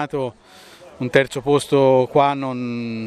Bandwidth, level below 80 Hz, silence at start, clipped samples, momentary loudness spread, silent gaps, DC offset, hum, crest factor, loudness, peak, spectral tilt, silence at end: 13.5 kHz; -56 dBFS; 0 s; under 0.1%; 11 LU; none; under 0.1%; none; 20 dB; -18 LUFS; 0 dBFS; -6 dB/octave; 0 s